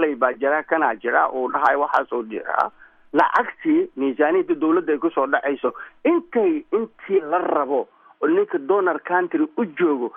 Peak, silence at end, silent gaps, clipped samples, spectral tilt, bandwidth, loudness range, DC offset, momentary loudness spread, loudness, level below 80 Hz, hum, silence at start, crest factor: -4 dBFS; 0.05 s; none; under 0.1%; -7.5 dB/octave; 5.8 kHz; 1 LU; under 0.1%; 6 LU; -21 LUFS; -68 dBFS; none; 0 s; 18 dB